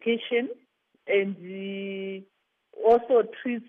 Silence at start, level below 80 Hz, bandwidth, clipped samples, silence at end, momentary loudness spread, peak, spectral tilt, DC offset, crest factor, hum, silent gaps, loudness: 0 s; -68 dBFS; 4.2 kHz; under 0.1%; 0.05 s; 17 LU; -10 dBFS; -7.5 dB/octave; under 0.1%; 18 dB; none; none; -26 LUFS